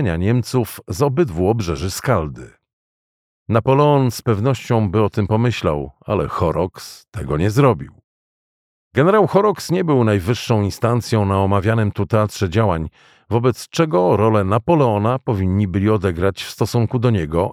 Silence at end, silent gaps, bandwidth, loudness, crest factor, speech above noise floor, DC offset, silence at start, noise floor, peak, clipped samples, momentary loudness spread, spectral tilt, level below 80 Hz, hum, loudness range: 0 s; 2.73-3.46 s, 8.04-8.91 s; 16 kHz; -18 LUFS; 16 dB; over 73 dB; under 0.1%; 0 s; under -90 dBFS; -2 dBFS; under 0.1%; 8 LU; -7 dB/octave; -40 dBFS; none; 3 LU